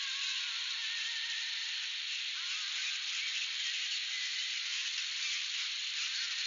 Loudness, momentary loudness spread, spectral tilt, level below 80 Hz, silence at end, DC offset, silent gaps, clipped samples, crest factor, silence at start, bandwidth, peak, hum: -34 LUFS; 2 LU; 15 dB/octave; under -90 dBFS; 0 s; under 0.1%; none; under 0.1%; 16 dB; 0 s; 7.4 kHz; -22 dBFS; none